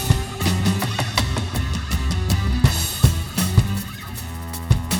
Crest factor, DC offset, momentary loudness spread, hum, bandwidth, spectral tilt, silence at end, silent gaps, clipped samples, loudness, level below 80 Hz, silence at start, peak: 20 dB; under 0.1%; 11 LU; none; 19.5 kHz; -4.5 dB/octave; 0 s; none; under 0.1%; -21 LUFS; -28 dBFS; 0 s; 0 dBFS